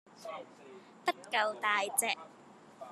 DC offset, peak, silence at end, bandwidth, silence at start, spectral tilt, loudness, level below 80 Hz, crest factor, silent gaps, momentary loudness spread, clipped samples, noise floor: under 0.1%; -12 dBFS; 0 s; 13.5 kHz; 0.15 s; 0 dB/octave; -33 LUFS; under -90 dBFS; 24 dB; none; 23 LU; under 0.1%; -57 dBFS